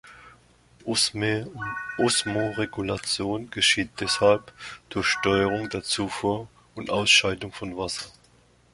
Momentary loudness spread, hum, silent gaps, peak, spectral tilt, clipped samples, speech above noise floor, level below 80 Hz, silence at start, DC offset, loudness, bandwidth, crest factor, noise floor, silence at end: 13 LU; none; none; -4 dBFS; -3 dB/octave; under 0.1%; 33 dB; -54 dBFS; 0.05 s; under 0.1%; -24 LUFS; 11.5 kHz; 22 dB; -59 dBFS; 0.65 s